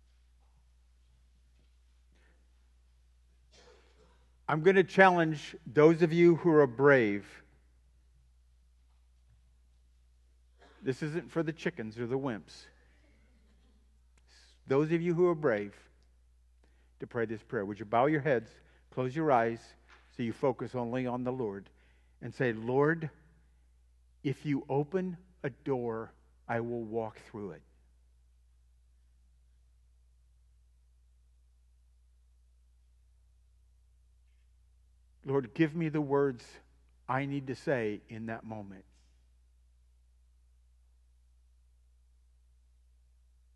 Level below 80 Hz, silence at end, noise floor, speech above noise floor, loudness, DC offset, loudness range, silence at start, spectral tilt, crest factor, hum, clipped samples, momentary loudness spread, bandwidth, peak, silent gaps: -64 dBFS; 4.75 s; -64 dBFS; 34 dB; -31 LUFS; under 0.1%; 15 LU; 4.5 s; -7.5 dB/octave; 26 dB; none; under 0.1%; 20 LU; 10.5 kHz; -8 dBFS; none